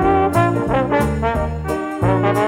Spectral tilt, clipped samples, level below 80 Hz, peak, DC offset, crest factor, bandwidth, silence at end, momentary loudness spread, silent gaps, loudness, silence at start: -7.5 dB/octave; under 0.1%; -30 dBFS; -2 dBFS; under 0.1%; 14 dB; 16.5 kHz; 0 s; 7 LU; none; -18 LUFS; 0 s